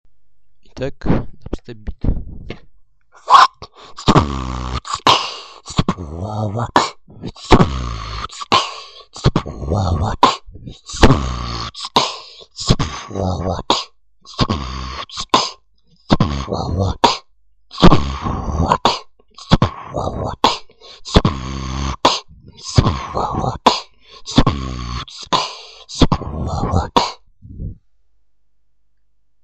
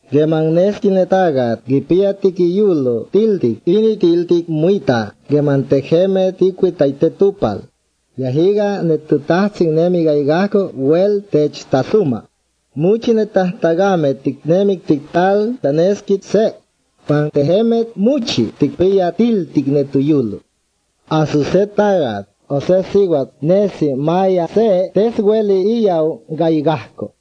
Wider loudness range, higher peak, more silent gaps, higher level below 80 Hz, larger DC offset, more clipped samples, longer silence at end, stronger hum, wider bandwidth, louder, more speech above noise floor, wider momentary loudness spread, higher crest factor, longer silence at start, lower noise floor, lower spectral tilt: about the same, 4 LU vs 2 LU; about the same, 0 dBFS vs 0 dBFS; neither; first, -28 dBFS vs -52 dBFS; first, 0.3% vs under 0.1%; first, 0.2% vs under 0.1%; first, 1.7 s vs 0.15 s; neither; first, 9.2 kHz vs 7.8 kHz; second, -18 LUFS vs -15 LUFS; about the same, 52 dB vs 50 dB; first, 19 LU vs 5 LU; about the same, 18 dB vs 14 dB; first, 0.65 s vs 0.1 s; first, -69 dBFS vs -65 dBFS; second, -5 dB/octave vs -7.5 dB/octave